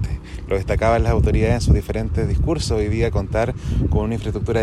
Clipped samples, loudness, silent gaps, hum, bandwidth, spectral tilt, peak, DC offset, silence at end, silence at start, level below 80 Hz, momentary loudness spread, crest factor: under 0.1%; -20 LUFS; none; none; 12.5 kHz; -7 dB/octave; -2 dBFS; under 0.1%; 0 s; 0 s; -24 dBFS; 7 LU; 16 dB